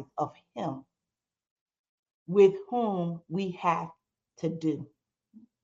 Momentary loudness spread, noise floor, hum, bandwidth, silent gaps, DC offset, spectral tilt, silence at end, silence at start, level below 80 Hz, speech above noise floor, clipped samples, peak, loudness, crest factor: 16 LU; under -90 dBFS; none; 7.4 kHz; 1.51-1.66 s, 1.79-2.03 s, 2.14-2.26 s; under 0.1%; -8 dB/octave; 0.25 s; 0 s; -76 dBFS; over 62 dB; under 0.1%; -10 dBFS; -29 LUFS; 22 dB